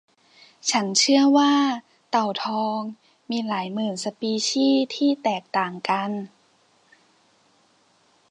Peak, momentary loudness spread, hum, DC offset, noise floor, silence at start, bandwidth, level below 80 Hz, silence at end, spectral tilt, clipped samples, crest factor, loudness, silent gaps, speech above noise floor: -4 dBFS; 13 LU; none; under 0.1%; -62 dBFS; 0.65 s; 10.5 kHz; -80 dBFS; 2.05 s; -3 dB/octave; under 0.1%; 20 dB; -23 LUFS; none; 40 dB